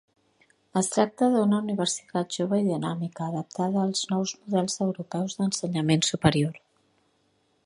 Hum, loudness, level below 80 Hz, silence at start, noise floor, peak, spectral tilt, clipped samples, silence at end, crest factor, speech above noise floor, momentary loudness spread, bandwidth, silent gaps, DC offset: none; -26 LUFS; -60 dBFS; 0.75 s; -69 dBFS; -4 dBFS; -5 dB/octave; under 0.1%; 1.1 s; 22 dB; 43 dB; 8 LU; 11.5 kHz; none; under 0.1%